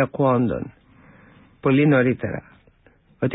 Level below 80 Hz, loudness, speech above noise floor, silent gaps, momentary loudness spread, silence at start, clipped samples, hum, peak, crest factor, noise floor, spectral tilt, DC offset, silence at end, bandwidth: -50 dBFS; -21 LUFS; 37 dB; none; 15 LU; 0 s; under 0.1%; none; -6 dBFS; 16 dB; -57 dBFS; -12.5 dB/octave; under 0.1%; 0 s; 4 kHz